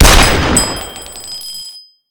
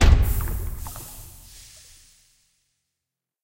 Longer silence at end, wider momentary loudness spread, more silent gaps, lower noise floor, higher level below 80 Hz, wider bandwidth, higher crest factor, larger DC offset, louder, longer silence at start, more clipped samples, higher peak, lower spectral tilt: second, 0.3 s vs 2.15 s; second, 18 LU vs 24 LU; neither; second, -34 dBFS vs -86 dBFS; first, -18 dBFS vs -26 dBFS; first, over 20 kHz vs 16 kHz; second, 12 dB vs 22 dB; neither; first, -12 LUFS vs -26 LUFS; about the same, 0 s vs 0 s; first, 0.9% vs under 0.1%; about the same, 0 dBFS vs -2 dBFS; second, -3 dB/octave vs -5 dB/octave